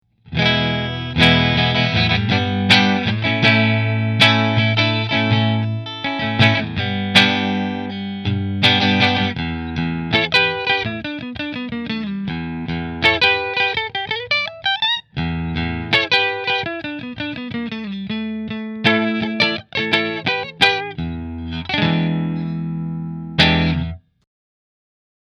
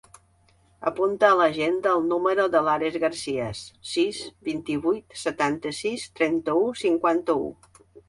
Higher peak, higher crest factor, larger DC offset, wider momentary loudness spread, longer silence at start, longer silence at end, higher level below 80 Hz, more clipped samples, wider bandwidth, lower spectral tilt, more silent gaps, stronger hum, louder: first, 0 dBFS vs -4 dBFS; about the same, 18 dB vs 20 dB; neither; first, 13 LU vs 10 LU; second, 0.25 s vs 0.8 s; first, 1.35 s vs 0.1 s; first, -40 dBFS vs -60 dBFS; neither; about the same, 12 kHz vs 11.5 kHz; about the same, -5.5 dB/octave vs -4.5 dB/octave; neither; neither; first, -18 LUFS vs -24 LUFS